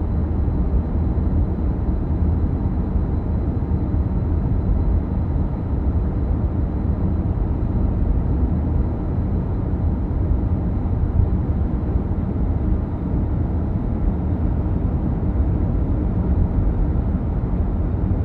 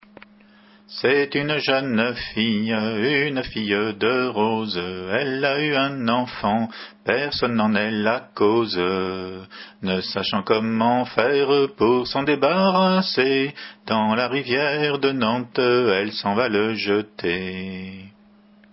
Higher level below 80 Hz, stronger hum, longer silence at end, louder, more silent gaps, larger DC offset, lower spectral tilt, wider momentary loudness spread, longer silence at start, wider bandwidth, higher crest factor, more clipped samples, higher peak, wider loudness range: first, -22 dBFS vs -54 dBFS; neither; second, 0 s vs 0.65 s; about the same, -22 LUFS vs -21 LUFS; neither; neither; first, -12.5 dB/octave vs -9.5 dB/octave; second, 2 LU vs 8 LU; second, 0 s vs 0.9 s; second, 2.9 kHz vs 5.8 kHz; second, 14 dB vs 20 dB; neither; about the same, -4 dBFS vs -2 dBFS; about the same, 1 LU vs 3 LU